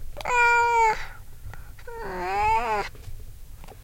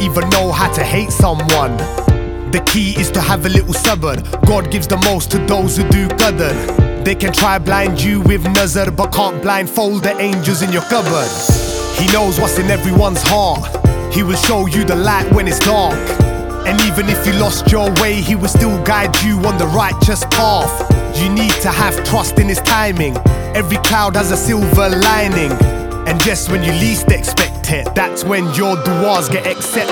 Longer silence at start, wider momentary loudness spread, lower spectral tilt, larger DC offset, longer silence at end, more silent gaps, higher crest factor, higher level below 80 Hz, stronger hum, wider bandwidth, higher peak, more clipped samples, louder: about the same, 0 s vs 0 s; first, 25 LU vs 4 LU; about the same, -3.5 dB/octave vs -4.5 dB/octave; neither; about the same, 0 s vs 0 s; neither; about the same, 18 dB vs 14 dB; second, -40 dBFS vs -22 dBFS; neither; second, 17 kHz vs over 20 kHz; second, -8 dBFS vs 0 dBFS; neither; second, -23 LUFS vs -13 LUFS